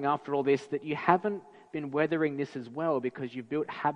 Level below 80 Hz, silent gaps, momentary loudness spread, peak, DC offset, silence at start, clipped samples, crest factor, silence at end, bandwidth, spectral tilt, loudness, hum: -74 dBFS; none; 11 LU; -6 dBFS; under 0.1%; 0 s; under 0.1%; 24 dB; 0 s; 9.6 kHz; -7.5 dB/octave; -31 LUFS; none